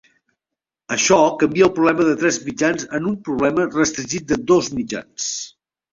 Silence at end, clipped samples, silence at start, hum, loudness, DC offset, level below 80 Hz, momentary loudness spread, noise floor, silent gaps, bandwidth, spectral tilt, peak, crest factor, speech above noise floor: 0.45 s; under 0.1%; 0.9 s; none; -19 LUFS; under 0.1%; -52 dBFS; 10 LU; -86 dBFS; none; 7.8 kHz; -4 dB/octave; -2 dBFS; 18 dB; 67 dB